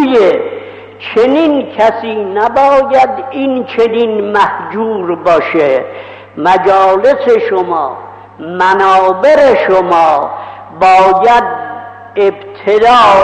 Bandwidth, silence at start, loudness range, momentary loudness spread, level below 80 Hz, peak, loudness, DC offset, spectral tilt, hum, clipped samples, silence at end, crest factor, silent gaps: 9.2 kHz; 0 s; 3 LU; 15 LU; -46 dBFS; 0 dBFS; -10 LUFS; under 0.1%; -5.5 dB/octave; none; under 0.1%; 0 s; 8 dB; none